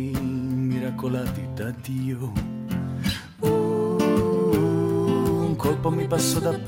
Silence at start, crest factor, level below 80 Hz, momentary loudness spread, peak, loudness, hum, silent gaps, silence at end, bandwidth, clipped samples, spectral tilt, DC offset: 0 s; 16 dB; -46 dBFS; 8 LU; -8 dBFS; -24 LUFS; none; none; 0 s; 17 kHz; under 0.1%; -6 dB/octave; under 0.1%